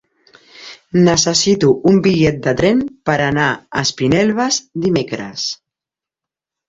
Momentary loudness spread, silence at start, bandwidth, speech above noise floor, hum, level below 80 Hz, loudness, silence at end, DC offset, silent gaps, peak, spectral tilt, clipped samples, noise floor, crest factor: 10 LU; 0.6 s; 8 kHz; 73 dB; none; -46 dBFS; -15 LUFS; 1.15 s; under 0.1%; none; -2 dBFS; -4.5 dB/octave; under 0.1%; -88 dBFS; 14 dB